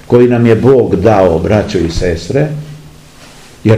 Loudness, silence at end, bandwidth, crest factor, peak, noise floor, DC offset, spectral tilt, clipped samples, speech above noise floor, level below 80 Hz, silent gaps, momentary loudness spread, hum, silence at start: -10 LUFS; 0 s; 12 kHz; 10 dB; 0 dBFS; -36 dBFS; 0.4%; -7.5 dB/octave; 2%; 27 dB; -30 dBFS; none; 9 LU; none; 0.1 s